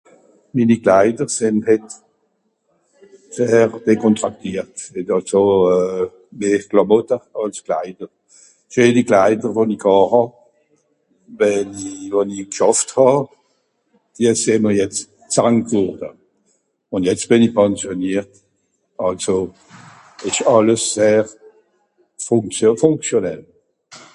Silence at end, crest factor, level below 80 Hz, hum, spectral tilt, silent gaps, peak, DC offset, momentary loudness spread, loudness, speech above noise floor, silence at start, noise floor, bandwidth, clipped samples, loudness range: 0.15 s; 18 dB; -56 dBFS; none; -5 dB/octave; none; 0 dBFS; under 0.1%; 13 LU; -17 LUFS; 51 dB; 0.55 s; -67 dBFS; 11.5 kHz; under 0.1%; 3 LU